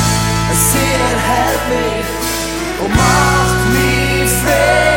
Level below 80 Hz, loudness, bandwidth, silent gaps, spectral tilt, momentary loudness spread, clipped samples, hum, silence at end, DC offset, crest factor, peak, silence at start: -24 dBFS; -13 LUFS; 17 kHz; none; -4 dB/octave; 7 LU; under 0.1%; none; 0 s; under 0.1%; 14 dB; 0 dBFS; 0 s